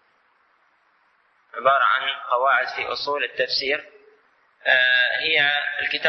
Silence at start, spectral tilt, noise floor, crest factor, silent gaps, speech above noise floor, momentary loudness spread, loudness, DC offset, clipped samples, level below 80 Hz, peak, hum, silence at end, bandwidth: 1.55 s; -2 dB/octave; -63 dBFS; 20 dB; none; 41 dB; 9 LU; -20 LUFS; under 0.1%; under 0.1%; -68 dBFS; -4 dBFS; none; 0 s; 6.2 kHz